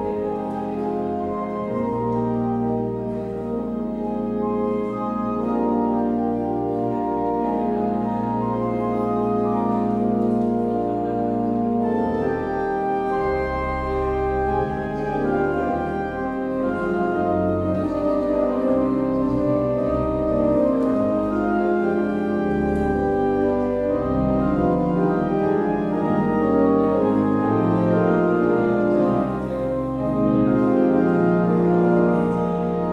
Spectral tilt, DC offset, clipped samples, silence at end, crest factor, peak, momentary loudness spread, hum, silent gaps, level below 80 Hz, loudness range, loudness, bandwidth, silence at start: -10 dB/octave; under 0.1%; under 0.1%; 0 s; 14 dB; -6 dBFS; 7 LU; none; none; -40 dBFS; 5 LU; -22 LUFS; 7.6 kHz; 0 s